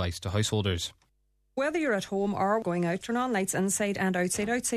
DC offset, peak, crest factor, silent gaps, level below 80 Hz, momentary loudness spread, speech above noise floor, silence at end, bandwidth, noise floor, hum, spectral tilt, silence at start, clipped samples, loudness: under 0.1%; -14 dBFS; 16 dB; none; -54 dBFS; 3 LU; 43 dB; 0 s; 14 kHz; -72 dBFS; none; -4.5 dB/octave; 0 s; under 0.1%; -29 LUFS